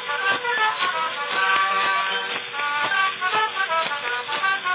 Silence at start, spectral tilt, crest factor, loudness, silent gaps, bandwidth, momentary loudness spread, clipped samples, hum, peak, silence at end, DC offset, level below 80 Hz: 0 s; 2.5 dB/octave; 18 dB; -22 LUFS; none; 4 kHz; 6 LU; under 0.1%; none; -6 dBFS; 0 s; under 0.1%; -84 dBFS